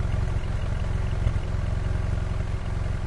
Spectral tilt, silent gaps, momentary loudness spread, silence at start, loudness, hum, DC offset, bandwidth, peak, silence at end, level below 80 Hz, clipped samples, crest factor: -7 dB/octave; none; 3 LU; 0 s; -29 LUFS; none; under 0.1%; 11 kHz; -10 dBFS; 0 s; -28 dBFS; under 0.1%; 14 dB